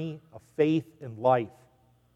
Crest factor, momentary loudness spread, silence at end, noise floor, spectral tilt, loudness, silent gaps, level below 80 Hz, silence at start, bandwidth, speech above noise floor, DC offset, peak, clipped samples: 18 dB; 18 LU; 0.65 s; -64 dBFS; -8.5 dB/octave; -27 LUFS; none; -72 dBFS; 0 s; 8.4 kHz; 36 dB; under 0.1%; -10 dBFS; under 0.1%